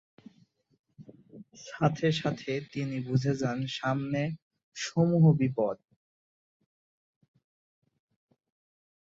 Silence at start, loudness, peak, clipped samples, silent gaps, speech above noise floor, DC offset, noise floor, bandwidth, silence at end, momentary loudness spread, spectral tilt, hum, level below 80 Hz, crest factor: 1 s; -29 LUFS; -10 dBFS; under 0.1%; 4.42-4.51 s, 4.63-4.72 s; 38 dB; under 0.1%; -66 dBFS; 7.8 kHz; 3.25 s; 18 LU; -6.5 dB/octave; none; -68 dBFS; 20 dB